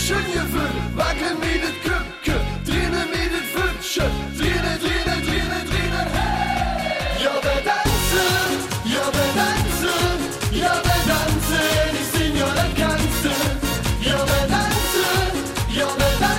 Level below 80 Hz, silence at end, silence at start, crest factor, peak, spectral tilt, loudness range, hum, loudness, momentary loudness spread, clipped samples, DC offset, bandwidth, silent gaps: -28 dBFS; 0 s; 0 s; 14 dB; -6 dBFS; -4 dB/octave; 3 LU; none; -21 LUFS; 5 LU; under 0.1%; under 0.1%; 17 kHz; none